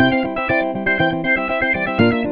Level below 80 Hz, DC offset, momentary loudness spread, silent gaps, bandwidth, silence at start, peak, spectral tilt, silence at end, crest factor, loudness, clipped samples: -44 dBFS; 0.5%; 2 LU; none; 5.2 kHz; 0 s; 0 dBFS; -8.5 dB/octave; 0 s; 16 dB; -18 LUFS; under 0.1%